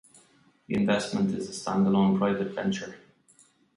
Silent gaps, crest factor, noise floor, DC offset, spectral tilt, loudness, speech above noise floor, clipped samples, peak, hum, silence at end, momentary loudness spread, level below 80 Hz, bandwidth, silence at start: none; 18 dB; -62 dBFS; under 0.1%; -6 dB/octave; -27 LUFS; 36 dB; under 0.1%; -10 dBFS; none; 0.8 s; 10 LU; -62 dBFS; 11.5 kHz; 0.7 s